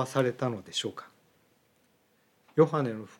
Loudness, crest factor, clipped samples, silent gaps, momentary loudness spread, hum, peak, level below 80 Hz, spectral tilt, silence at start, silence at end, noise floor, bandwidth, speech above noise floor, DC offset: -29 LUFS; 22 dB; under 0.1%; none; 11 LU; none; -8 dBFS; -82 dBFS; -5.5 dB/octave; 0 s; 0.1 s; -68 dBFS; 14 kHz; 40 dB; under 0.1%